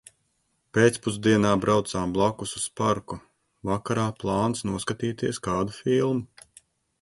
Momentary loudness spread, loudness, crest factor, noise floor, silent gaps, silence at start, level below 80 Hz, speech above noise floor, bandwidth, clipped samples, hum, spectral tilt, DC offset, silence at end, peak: 9 LU; -25 LUFS; 20 dB; -72 dBFS; none; 0.75 s; -52 dBFS; 48 dB; 11.5 kHz; under 0.1%; none; -5.5 dB/octave; under 0.1%; 0.75 s; -6 dBFS